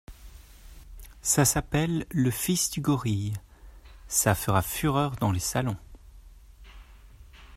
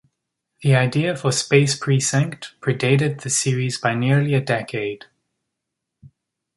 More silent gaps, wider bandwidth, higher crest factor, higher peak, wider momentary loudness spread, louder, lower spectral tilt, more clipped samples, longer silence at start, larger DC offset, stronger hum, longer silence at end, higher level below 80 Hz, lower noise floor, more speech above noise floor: neither; first, 16 kHz vs 11.5 kHz; about the same, 20 dB vs 18 dB; second, -8 dBFS vs -2 dBFS; about the same, 9 LU vs 9 LU; second, -26 LUFS vs -20 LUFS; about the same, -4.5 dB/octave vs -5 dB/octave; neither; second, 0.1 s vs 0.6 s; neither; neither; second, 0 s vs 0.5 s; first, -46 dBFS vs -60 dBFS; second, -50 dBFS vs -81 dBFS; second, 24 dB vs 62 dB